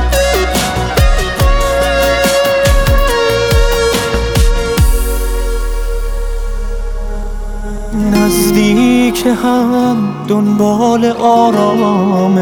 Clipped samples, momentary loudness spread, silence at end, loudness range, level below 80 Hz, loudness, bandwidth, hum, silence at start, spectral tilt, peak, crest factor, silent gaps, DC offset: under 0.1%; 12 LU; 0 s; 6 LU; -16 dBFS; -12 LUFS; over 20 kHz; none; 0 s; -5 dB/octave; 0 dBFS; 10 dB; none; under 0.1%